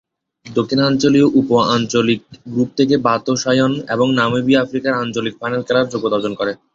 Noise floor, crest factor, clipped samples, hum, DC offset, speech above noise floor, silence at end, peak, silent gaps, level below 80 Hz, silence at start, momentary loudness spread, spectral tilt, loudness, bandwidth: -40 dBFS; 14 dB; under 0.1%; none; under 0.1%; 24 dB; 0.2 s; -2 dBFS; none; -54 dBFS; 0.45 s; 9 LU; -5.5 dB/octave; -16 LUFS; 7.6 kHz